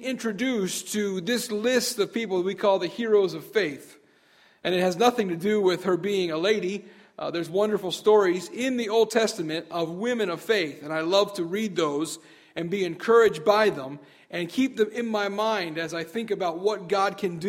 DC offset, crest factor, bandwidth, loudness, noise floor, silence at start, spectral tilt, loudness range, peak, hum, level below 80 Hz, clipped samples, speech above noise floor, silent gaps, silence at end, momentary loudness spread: under 0.1%; 20 dB; 16 kHz; -25 LUFS; -59 dBFS; 0 s; -4 dB/octave; 3 LU; -6 dBFS; none; -70 dBFS; under 0.1%; 34 dB; none; 0 s; 10 LU